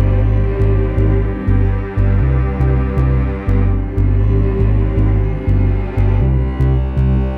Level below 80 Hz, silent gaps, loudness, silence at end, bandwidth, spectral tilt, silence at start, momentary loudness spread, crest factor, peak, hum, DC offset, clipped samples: -16 dBFS; none; -16 LUFS; 0 s; 3.7 kHz; -10.5 dB/octave; 0 s; 3 LU; 10 dB; -2 dBFS; none; under 0.1%; under 0.1%